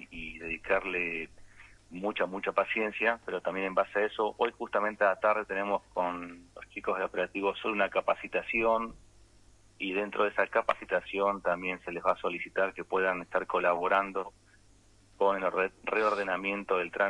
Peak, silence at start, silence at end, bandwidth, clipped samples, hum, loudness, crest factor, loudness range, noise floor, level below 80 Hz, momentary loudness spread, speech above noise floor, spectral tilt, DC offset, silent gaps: -12 dBFS; 0 s; 0 s; 11 kHz; under 0.1%; none; -31 LUFS; 18 dB; 2 LU; -61 dBFS; -62 dBFS; 9 LU; 30 dB; -5.5 dB/octave; under 0.1%; none